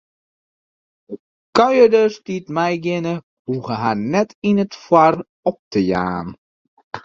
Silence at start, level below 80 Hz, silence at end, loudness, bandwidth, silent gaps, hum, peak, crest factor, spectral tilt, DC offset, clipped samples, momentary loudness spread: 1.1 s; -54 dBFS; 0.05 s; -18 LUFS; 7.6 kHz; 1.20-1.53 s, 3.23-3.45 s, 4.35-4.42 s, 5.29-5.43 s, 5.59-5.71 s, 6.38-6.77 s, 6.83-6.91 s; none; 0 dBFS; 18 dB; -6.5 dB/octave; under 0.1%; under 0.1%; 18 LU